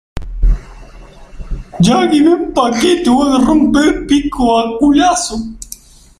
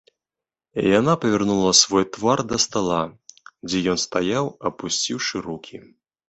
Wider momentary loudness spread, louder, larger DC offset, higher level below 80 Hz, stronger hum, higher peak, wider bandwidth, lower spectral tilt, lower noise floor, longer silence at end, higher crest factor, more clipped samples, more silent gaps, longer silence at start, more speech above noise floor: first, 19 LU vs 16 LU; first, -12 LUFS vs -20 LUFS; neither; first, -24 dBFS vs -54 dBFS; neither; about the same, 0 dBFS vs 0 dBFS; first, 15 kHz vs 8.6 kHz; first, -5 dB/octave vs -3.5 dB/octave; second, -36 dBFS vs -89 dBFS; about the same, 0.45 s vs 0.5 s; second, 12 dB vs 22 dB; neither; neither; second, 0.15 s vs 0.75 s; second, 25 dB vs 68 dB